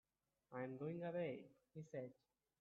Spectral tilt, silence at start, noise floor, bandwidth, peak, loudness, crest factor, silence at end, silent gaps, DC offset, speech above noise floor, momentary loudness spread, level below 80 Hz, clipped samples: -7 dB/octave; 0.5 s; -78 dBFS; 7.2 kHz; -34 dBFS; -50 LUFS; 16 dB; 0.5 s; none; under 0.1%; 28 dB; 12 LU; -88 dBFS; under 0.1%